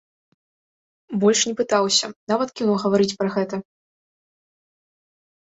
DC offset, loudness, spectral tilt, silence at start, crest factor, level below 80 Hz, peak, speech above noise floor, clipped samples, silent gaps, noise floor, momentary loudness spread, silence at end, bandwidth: under 0.1%; -21 LUFS; -3.5 dB/octave; 1.1 s; 20 dB; -66 dBFS; -4 dBFS; over 69 dB; under 0.1%; 2.16-2.27 s; under -90 dBFS; 9 LU; 1.8 s; 8.2 kHz